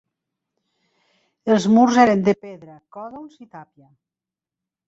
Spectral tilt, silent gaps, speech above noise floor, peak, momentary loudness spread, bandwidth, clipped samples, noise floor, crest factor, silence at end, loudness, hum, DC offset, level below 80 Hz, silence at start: -6 dB/octave; none; 70 dB; -2 dBFS; 25 LU; 8 kHz; under 0.1%; -89 dBFS; 20 dB; 1.25 s; -17 LUFS; none; under 0.1%; -62 dBFS; 1.45 s